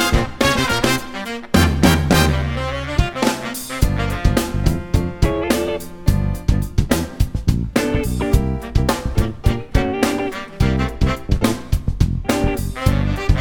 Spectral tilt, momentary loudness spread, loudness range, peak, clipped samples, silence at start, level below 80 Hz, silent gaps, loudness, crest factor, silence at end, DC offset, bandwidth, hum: -5.5 dB/octave; 6 LU; 3 LU; 0 dBFS; under 0.1%; 0 s; -24 dBFS; none; -19 LUFS; 18 dB; 0 s; under 0.1%; 19 kHz; none